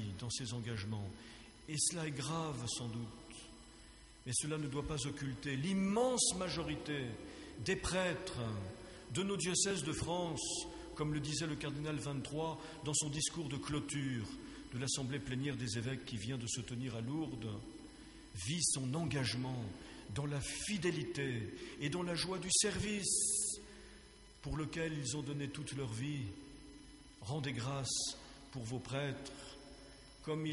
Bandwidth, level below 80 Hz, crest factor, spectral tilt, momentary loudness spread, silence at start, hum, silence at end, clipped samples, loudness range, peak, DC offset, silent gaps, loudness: 11.5 kHz; -60 dBFS; 20 dB; -3.5 dB/octave; 19 LU; 0 s; none; 0 s; under 0.1%; 6 LU; -20 dBFS; under 0.1%; none; -39 LUFS